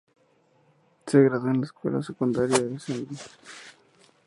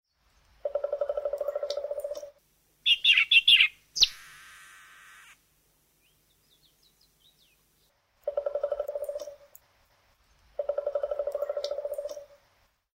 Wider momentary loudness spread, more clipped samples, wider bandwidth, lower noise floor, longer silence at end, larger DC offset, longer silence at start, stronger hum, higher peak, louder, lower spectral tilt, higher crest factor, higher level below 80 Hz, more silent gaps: about the same, 23 LU vs 23 LU; neither; second, 11.5 kHz vs 16 kHz; second, -64 dBFS vs -69 dBFS; second, 0.55 s vs 0.7 s; neither; first, 1.05 s vs 0.65 s; neither; first, -6 dBFS vs -10 dBFS; about the same, -25 LUFS vs -25 LUFS; first, -6 dB/octave vs 1.5 dB/octave; about the same, 22 dB vs 22 dB; about the same, -66 dBFS vs -64 dBFS; neither